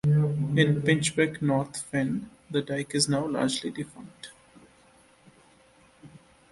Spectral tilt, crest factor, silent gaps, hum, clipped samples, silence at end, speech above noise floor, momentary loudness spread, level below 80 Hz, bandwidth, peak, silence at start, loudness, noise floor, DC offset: -5 dB/octave; 20 dB; none; none; under 0.1%; 0.45 s; 32 dB; 16 LU; -60 dBFS; 11.5 kHz; -8 dBFS; 0.05 s; -27 LUFS; -59 dBFS; under 0.1%